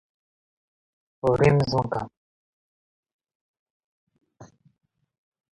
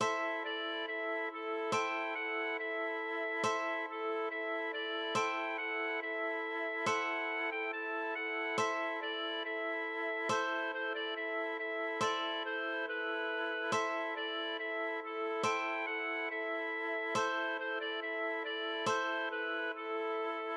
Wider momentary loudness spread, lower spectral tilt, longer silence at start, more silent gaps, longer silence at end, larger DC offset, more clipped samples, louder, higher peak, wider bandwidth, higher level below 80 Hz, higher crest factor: first, 12 LU vs 3 LU; first, -7.5 dB/octave vs -2.5 dB/octave; first, 1.25 s vs 0 s; first, 2.17-3.03 s, 3.13-3.19 s, 3.35-4.07 s vs none; first, 1.1 s vs 0 s; neither; neither; first, -23 LUFS vs -36 LUFS; first, -8 dBFS vs -20 dBFS; about the same, 10.5 kHz vs 11.5 kHz; first, -52 dBFS vs -84 dBFS; about the same, 22 dB vs 18 dB